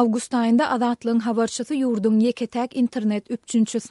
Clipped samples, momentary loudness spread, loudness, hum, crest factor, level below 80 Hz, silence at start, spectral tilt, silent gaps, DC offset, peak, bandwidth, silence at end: under 0.1%; 6 LU; -22 LUFS; none; 14 dB; -68 dBFS; 0 s; -5 dB/octave; none; under 0.1%; -8 dBFS; 11.5 kHz; 0.05 s